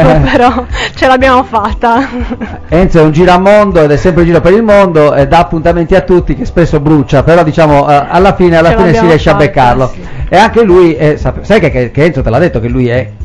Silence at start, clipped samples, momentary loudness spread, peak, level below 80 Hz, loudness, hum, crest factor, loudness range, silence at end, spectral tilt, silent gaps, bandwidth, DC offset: 0 s; 10%; 7 LU; 0 dBFS; -20 dBFS; -7 LUFS; none; 6 dB; 2 LU; 0 s; -7 dB/octave; none; 12 kHz; under 0.1%